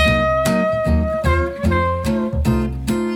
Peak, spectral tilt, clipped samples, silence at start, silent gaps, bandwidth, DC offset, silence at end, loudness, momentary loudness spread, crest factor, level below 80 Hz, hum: -2 dBFS; -6.5 dB/octave; under 0.1%; 0 s; none; 17.5 kHz; under 0.1%; 0 s; -18 LUFS; 4 LU; 14 dB; -26 dBFS; none